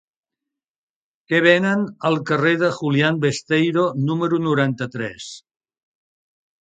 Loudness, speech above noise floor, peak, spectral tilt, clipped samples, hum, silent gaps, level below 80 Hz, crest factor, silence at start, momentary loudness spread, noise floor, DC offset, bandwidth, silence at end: -19 LUFS; 66 dB; 0 dBFS; -6 dB/octave; under 0.1%; none; none; -64 dBFS; 22 dB; 1.3 s; 12 LU; -85 dBFS; under 0.1%; 9.2 kHz; 1.3 s